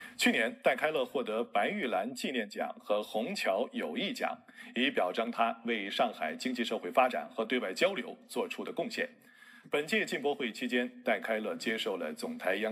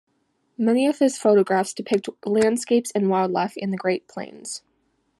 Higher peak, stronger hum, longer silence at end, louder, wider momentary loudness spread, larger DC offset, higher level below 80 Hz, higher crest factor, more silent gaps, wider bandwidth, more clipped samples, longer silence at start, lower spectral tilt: second, -12 dBFS vs -6 dBFS; neither; second, 0 s vs 0.6 s; second, -33 LUFS vs -22 LUFS; second, 8 LU vs 15 LU; neither; second, under -90 dBFS vs -70 dBFS; about the same, 20 dB vs 16 dB; neither; first, 16 kHz vs 12.5 kHz; neither; second, 0 s vs 0.6 s; second, -3.5 dB/octave vs -5 dB/octave